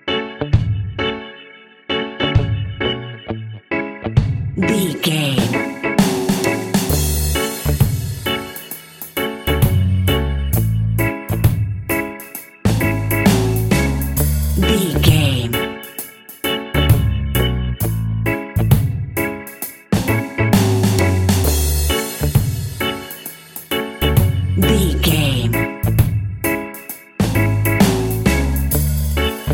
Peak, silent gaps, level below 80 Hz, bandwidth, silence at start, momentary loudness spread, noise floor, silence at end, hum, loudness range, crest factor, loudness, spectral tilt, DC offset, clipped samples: 0 dBFS; none; -26 dBFS; 17 kHz; 0.05 s; 12 LU; -42 dBFS; 0 s; none; 3 LU; 18 dB; -18 LUFS; -5.5 dB/octave; under 0.1%; under 0.1%